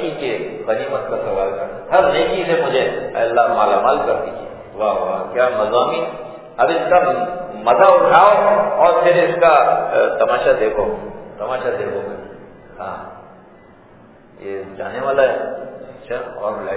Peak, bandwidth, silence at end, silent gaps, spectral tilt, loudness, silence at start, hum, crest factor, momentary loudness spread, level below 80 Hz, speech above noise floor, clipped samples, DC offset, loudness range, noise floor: 0 dBFS; 4 kHz; 0 s; none; -8.5 dB/octave; -16 LUFS; 0 s; none; 16 dB; 18 LU; -50 dBFS; 29 dB; under 0.1%; under 0.1%; 14 LU; -45 dBFS